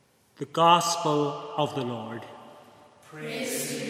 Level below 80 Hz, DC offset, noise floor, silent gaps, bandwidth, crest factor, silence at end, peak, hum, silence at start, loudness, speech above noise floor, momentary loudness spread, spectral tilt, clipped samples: -80 dBFS; under 0.1%; -53 dBFS; none; 16 kHz; 22 dB; 0 s; -6 dBFS; none; 0.4 s; -26 LUFS; 27 dB; 21 LU; -3.5 dB/octave; under 0.1%